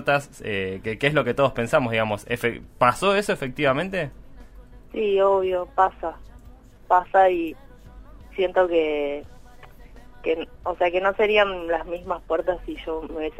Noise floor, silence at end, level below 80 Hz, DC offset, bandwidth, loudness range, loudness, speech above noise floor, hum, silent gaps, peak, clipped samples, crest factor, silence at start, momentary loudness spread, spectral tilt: -47 dBFS; 0.1 s; -46 dBFS; under 0.1%; 16 kHz; 3 LU; -23 LUFS; 24 dB; none; none; -4 dBFS; under 0.1%; 20 dB; 0 s; 12 LU; -5.5 dB/octave